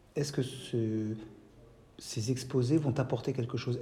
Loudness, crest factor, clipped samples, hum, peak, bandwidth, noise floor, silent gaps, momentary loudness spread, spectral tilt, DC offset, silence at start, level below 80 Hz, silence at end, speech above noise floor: -33 LUFS; 16 dB; under 0.1%; none; -16 dBFS; 15 kHz; -57 dBFS; none; 11 LU; -6.5 dB/octave; under 0.1%; 0.15 s; -64 dBFS; 0 s; 25 dB